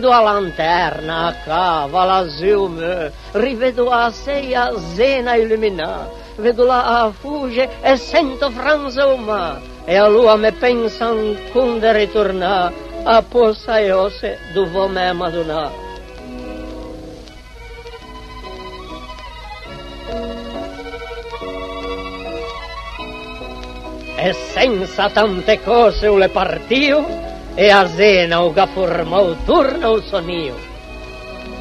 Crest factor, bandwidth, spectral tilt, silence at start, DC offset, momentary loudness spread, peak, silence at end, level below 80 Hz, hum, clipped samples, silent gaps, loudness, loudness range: 16 dB; 12.5 kHz; -5 dB/octave; 0 s; under 0.1%; 19 LU; 0 dBFS; 0 s; -36 dBFS; none; under 0.1%; none; -16 LUFS; 16 LU